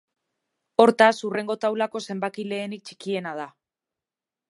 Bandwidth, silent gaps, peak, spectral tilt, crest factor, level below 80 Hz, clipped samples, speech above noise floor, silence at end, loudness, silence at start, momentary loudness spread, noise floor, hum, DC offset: 11.5 kHz; none; -2 dBFS; -5 dB/octave; 24 dB; -76 dBFS; under 0.1%; 67 dB; 1 s; -23 LUFS; 0.8 s; 17 LU; -90 dBFS; none; under 0.1%